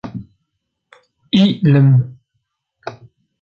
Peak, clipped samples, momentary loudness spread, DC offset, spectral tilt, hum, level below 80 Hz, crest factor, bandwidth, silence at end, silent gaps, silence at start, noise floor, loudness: -2 dBFS; under 0.1%; 22 LU; under 0.1%; -8.5 dB/octave; none; -54 dBFS; 16 dB; 6.8 kHz; 0.5 s; none; 0.05 s; -73 dBFS; -13 LUFS